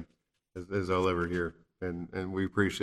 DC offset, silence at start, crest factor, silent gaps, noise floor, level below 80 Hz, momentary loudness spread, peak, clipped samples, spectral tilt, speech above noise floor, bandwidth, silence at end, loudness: under 0.1%; 0 s; 20 dB; none; -74 dBFS; -60 dBFS; 16 LU; -12 dBFS; under 0.1%; -6.5 dB/octave; 43 dB; 13.5 kHz; 0 s; -33 LUFS